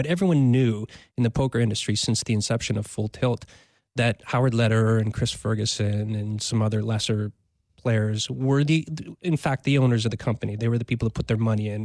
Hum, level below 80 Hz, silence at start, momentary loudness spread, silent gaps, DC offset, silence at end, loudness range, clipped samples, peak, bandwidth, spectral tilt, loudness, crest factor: none; -50 dBFS; 0 s; 7 LU; none; under 0.1%; 0 s; 2 LU; under 0.1%; -10 dBFS; 11 kHz; -5.5 dB/octave; -24 LUFS; 12 dB